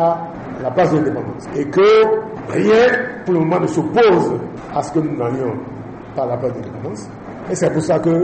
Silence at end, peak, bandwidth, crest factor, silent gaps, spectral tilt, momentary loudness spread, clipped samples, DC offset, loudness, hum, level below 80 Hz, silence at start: 0 s; -4 dBFS; 8.8 kHz; 12 dB; none; -6.5 dB/octave; 16 LU; under 0.1%; under 0.1%; -17 LUFS; none; -50 dBFS; 0 s